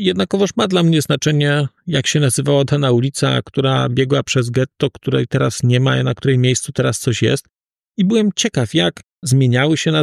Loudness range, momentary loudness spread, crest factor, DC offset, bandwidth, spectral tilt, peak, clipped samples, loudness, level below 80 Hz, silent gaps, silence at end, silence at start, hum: 2 LU; 5 LU; 12 dB; under 0.1%; 13 kHz; -5 dB/octave; -4 dBFS; under 0.1%; -16 LUFS; -52 dBFS; none; 0 s; 0 s; none